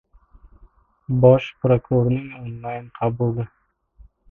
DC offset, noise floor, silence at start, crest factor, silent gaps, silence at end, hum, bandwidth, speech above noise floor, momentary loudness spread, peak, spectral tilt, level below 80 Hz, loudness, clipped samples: under 0.1%; -53 dBFS; 1.1 s; 20 dB; none; 0.85 s; none; 3.6 kHz; 34 dB; 18 LU; 0 dBFS; -10 dB/octave; -48 dBFS; -20 LUFS; under 0.1%